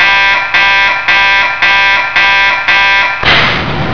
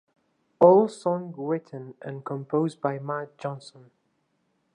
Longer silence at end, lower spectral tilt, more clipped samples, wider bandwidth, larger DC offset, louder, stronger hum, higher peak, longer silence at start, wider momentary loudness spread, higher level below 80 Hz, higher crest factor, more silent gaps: second, 0 s vs 1.05 s; second, -3 dB/octave vs -8 dB/octave; first, 0.6% vs under 0.1%; second, 5.4 kHz vs 10.5 kHz; first, 3% vs under 0.1%; first, -7 LUFS vs -25 LUFS; neither; first, 0 dBFS vs -4 dBFS; second, 0 s vs 0.6 s; second, 2 LU vs 20 LU; first, -34 dBFS vs -80 dBFS; second, 8 dB vs 22 dB; neither